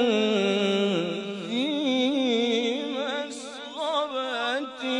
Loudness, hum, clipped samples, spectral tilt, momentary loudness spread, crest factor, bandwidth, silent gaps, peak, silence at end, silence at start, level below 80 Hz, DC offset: -26 LUFS; none; under 0.1%; -4.5 dB/octave; 9 LU; 14 dB; 11 kHz; none; -12 dBFS; 0 s; 0 s; -80 dBFS; under 0.1%